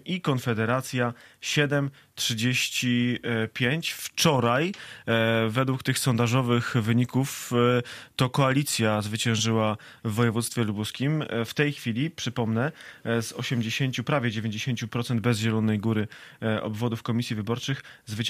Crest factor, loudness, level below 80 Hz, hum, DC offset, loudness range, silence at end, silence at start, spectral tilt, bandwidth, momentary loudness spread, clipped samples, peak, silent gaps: 18 dB; -26 LUFS; -62 dBFS; none; under 0.1%; 3 LU; 0 s; 0.05 s; -5 dB/octave; 15.5 kHz; 7 LU; under 0.1%; -8 dBFS; none